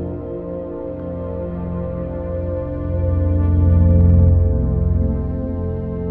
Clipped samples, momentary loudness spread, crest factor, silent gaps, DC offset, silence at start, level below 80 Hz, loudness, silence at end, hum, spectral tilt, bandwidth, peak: under 0.1%; 14 LU; 14 dB; none; 0.3%; 0 s; -24 dBFS; -19 LUFS; 0 s; none; -13.5 dB/octave; 2.5 kHz; -4 dBFS